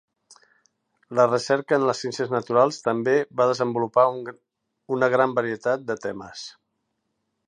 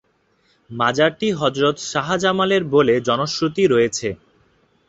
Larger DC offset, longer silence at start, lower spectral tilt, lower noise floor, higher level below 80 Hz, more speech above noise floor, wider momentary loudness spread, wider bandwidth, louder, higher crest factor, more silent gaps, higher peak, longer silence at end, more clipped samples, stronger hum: neither; first, 1.1 s vs 0.7 s; about the same, -5 dB/octave vs -4.5 dB/octave; first, -76 dBFS vs -62 dBFS; second, -72 dBFS vs -56 dBFS; first, 54 dB vs 44 dB; first, 14 LU vs 8 LU; first, 10.5 kHz vs 8 kHz; second, -23 LUFS vs -18 LUFS; about the same, 18 dB vs 18 dB; neither; second, -6 dBFS vs -2 dBFS; first, 0.95 s vs 0.75 s; neither; neither